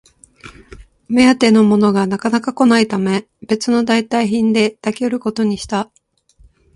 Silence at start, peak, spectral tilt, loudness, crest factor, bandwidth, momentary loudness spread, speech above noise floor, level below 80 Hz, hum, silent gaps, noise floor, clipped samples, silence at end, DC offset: 0.45 s; 0 dBFS; -5.5 dB/octave; -15 LUFS; 16 dB; 11.5 kHz; 10 LU; 36 dB; -50 dBFS; none; none; -51 dBFS; under 0.1%; 0.9 s; under 0.1%